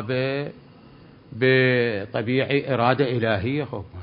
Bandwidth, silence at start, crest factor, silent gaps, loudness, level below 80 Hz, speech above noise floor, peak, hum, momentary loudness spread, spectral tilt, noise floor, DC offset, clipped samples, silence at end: 5.4 kHz; 0 s; 20 dB; none; -22 LUFS; -52 dBFS; 26 dB; -4 dBFS; none; 12 LU; -11 dB/octave; -48 dBFS; under 0.1%; under 0.1%; 0 s